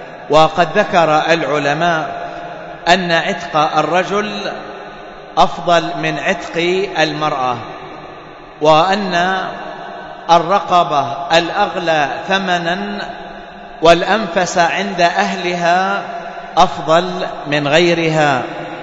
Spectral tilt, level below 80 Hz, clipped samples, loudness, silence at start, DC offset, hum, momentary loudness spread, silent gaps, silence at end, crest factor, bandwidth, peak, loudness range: -4.5 dB/octave; -46 dBFS; under 0.1%; -15 LUFS; 0 s; under 0.1%; none; 16 LU; none; 0 s; 16 dB; 8 kHz; 0 dBFS; 2 LU